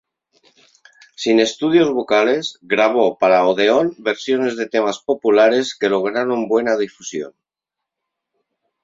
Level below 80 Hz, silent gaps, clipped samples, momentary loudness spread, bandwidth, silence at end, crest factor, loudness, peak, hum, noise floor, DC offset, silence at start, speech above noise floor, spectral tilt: -64 dBFS; none; under 0.1%; 8 LU; 7.8 kHz; 1.55 s; 16 dB; -17 LUFS; -2 dBFS; none; -84 dBFS; under 0.1%; 1.2 s; 67 dB; -4 dB/octave